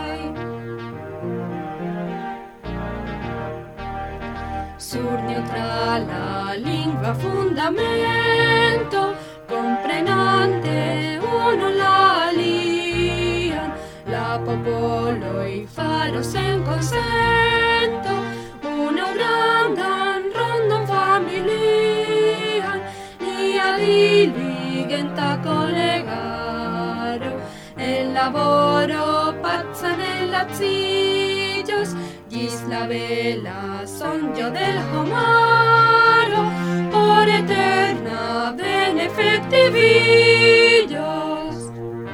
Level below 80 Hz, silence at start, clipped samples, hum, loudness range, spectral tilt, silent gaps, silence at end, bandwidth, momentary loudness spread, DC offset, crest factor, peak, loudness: -44 dBFS; 0 s; under 0.1%; none; 9 LU; -5 dB/octave; none; 0 s; 16.5 kHz; 15 LU; under 0.1%; 18 dB; 0 dBFS; -19 LUFS